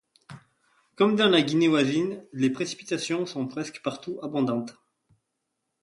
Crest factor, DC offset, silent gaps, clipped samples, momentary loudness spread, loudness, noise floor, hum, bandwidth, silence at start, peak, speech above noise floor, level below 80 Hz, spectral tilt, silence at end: 20 dB; under 0.1%; none; under 0.1%; 12 LU; -26 LUFS; -81 dBFS; none; 11.5 kHz; 0.3 s; -8 dBFS; 55 dB; -70 dBFS; -5 dB/octave; 1.1 s